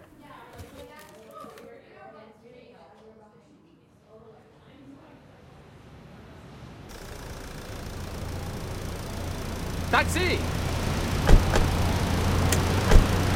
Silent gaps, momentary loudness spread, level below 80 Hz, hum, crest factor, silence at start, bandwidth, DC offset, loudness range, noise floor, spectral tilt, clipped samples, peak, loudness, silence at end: none; 26 LU; -30 dBFS; none; 26 dB; 0.25 s; 16.5 kHz; under 0.1%; 25 LU; -57 dBFS; -5 dB/octave; under 0.1%; 0 dBFS; -26 LUFS; 0 s